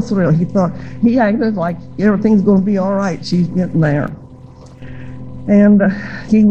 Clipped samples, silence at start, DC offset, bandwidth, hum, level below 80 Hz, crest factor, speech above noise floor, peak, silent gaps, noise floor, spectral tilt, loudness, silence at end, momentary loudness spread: under 0.1%; 0 s; 1%; 7.2 kHz; none; -42 dBFS; 12 dB; 24 dB; -2 dBFS; none; -37 dBFS; -8.5 dB/octave; -14 LUFS; 0 s; 17 LU